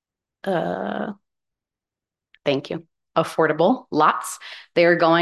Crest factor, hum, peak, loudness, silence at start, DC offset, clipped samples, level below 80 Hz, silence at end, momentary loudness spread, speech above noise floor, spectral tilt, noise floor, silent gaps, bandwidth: 18 dB; none; -4 dBFS; -21 LUFS; 0.45 s; under 0.1%; under 0.1%; -68 dBFS; 0 s; 15 LU; 68 dB; -5 dB/octave; -89 dBFS; none; 12.5 kHz